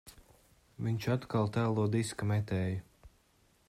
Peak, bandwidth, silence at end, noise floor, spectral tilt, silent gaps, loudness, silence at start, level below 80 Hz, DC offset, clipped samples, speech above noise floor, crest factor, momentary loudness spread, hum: -20 dBFS; 14 kHz; 0.6 s; -69 dBFS; -7 dB/octave; none; -34 LUFS; 0.05 s; -64 dBFS; under 0.1%; under 0.1%; 37 dB; 16 dB; 6 LU; none